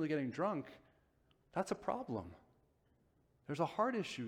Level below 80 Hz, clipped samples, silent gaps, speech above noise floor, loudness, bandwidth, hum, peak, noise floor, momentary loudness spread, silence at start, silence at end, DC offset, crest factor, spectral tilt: -74 dBFS; under 0.1%; none; 35 dB; -40 LUFS; 15 kHz; none; -22 dBFS; -75 dBFS; 15 LU; 0 s; 0 s; under 0.1%; 20 dB; -6 dB/octave